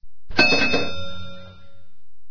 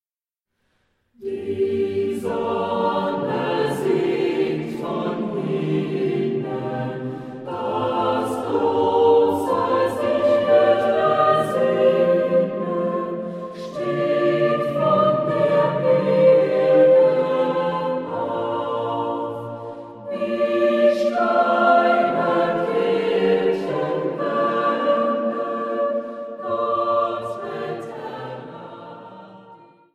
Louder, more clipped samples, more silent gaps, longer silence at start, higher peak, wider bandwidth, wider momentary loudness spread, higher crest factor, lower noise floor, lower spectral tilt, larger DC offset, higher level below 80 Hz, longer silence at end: about the same, -19 LUFS vs -20 LUFS; neither; neither; second, 0 s vs 1.2 s; first, 0 dBFS vs -4 dBFS; second, 5.4 kHz vs 13 kHz; first, 22 LU vs 15 LU; first, 22 dB vs 16 dB; second, -49 dBFS vs under -90 dBFS; second, -3.5 dB/octave vs -7 dB/octave; neither; first, -46 dBFS vs -64 dBFS; second, 0 s vs 0.4 s